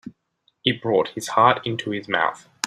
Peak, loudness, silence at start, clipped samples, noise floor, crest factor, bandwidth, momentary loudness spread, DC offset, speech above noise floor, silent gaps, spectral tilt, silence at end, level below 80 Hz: -2 dBFS; -22 LUFS; 0.05 s; under 0.1%; -68 dBFS; 22 dB; 15.5 kHz; 8 LU; under 0.1%; 46 dB; none; -4 dB/octave; 0 s; -62 dBFS